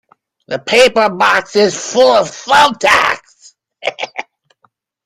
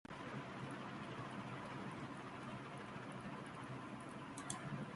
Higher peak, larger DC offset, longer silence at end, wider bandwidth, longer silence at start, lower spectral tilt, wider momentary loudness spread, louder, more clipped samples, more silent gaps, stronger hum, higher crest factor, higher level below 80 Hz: first, 0 dBFS vs -26 dBFS; neither; first, 0.85 s vs 0 s; first, 15.5 kHz vs 11.5 kHz; first, 0.5 s vs 0.1 s; second, -2.5 dB/octave vs -5 dB/octave; first, 14 LU vs 3 LU; first, -12 LUFS vs -49 LUFS; neither; neither; neither; second, 14 dB vs 22 dB; first, -52 dBFS vs -74 dBFS